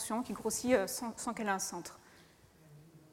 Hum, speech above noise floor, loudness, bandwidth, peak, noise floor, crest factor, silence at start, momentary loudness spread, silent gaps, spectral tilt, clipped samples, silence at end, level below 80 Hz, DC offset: none; 26 dB; -35 LUFS; 16.5 kHz; -16 dBFS; -62 dBFS; 22 dB; 0 s; 10 LU; none; -3 dB/octave; under 0.1%; 0.15 s; -68 dBFS; under 0.1%